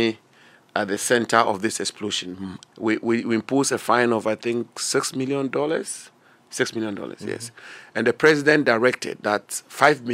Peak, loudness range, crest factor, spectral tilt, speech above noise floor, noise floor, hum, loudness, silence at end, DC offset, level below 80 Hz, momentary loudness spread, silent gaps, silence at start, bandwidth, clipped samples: 0 dBFS; 4 LU; 22 dB; -3.5 dB/octave; 31 dB; -54 dBFS; none; -22 LUFS; 0 s; under 0.1%; -70 dBFS; 15 LU; none; 0 s; 16 kHz; under 0.1%